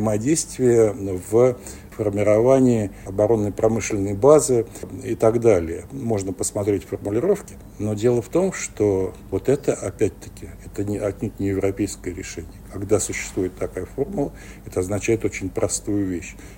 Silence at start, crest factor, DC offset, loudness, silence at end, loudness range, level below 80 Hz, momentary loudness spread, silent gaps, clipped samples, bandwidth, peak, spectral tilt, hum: 0 s; 22 dB; under 0.1%; -22 LUFS; 0 s; 7 LU; -44 dBFS; 14 LU; none; under 0.1%; 16.5 kHz; 0 dBFS; -6 dB/octave; none